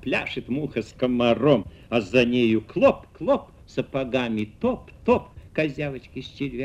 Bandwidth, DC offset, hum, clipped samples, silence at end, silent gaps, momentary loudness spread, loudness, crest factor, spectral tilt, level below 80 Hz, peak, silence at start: 9 kHz; under 0.1%; none; under 0.1%; 0 s; none; 11 LU; -24 LUFS; 20 dB; -7 dB/octave; -50 dBFS; -4 dBFS; 0 s